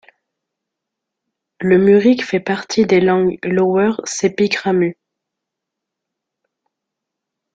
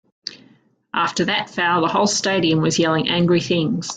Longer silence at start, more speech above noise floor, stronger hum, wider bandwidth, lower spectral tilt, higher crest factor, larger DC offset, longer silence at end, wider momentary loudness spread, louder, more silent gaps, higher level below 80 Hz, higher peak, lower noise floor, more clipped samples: first, 1.6 s vs 0.25 s; first, 67 dB vs 36 dB; neither; about the same, 9 kHz vs 9.4 kHz; first, -5.5 dB/octave vs -4 dB/octave; about the same, 16 dB vs 14 dB; neither; first, 2.6 s vs 0 s; about the same, 8 LU vs 9 LU; first, -15 LUFS vs -18 LUFS; neither; about the same, -58 dBFS vs -58 dBFS; about the same, -2 dBFS vs -4 dBFS; first, -81 dBFS vs -55 dBFS; neither